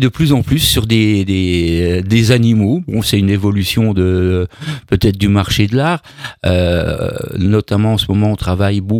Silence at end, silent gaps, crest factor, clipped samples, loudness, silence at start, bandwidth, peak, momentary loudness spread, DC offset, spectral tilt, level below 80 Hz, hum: 0 s; none; 14 dB; under 0.1%; -14 LUFS; 0 s; 18.5 kHz; 0 dBFS; 7 LU; under 0.1%; -6 dB/octave; -32 dBFS; none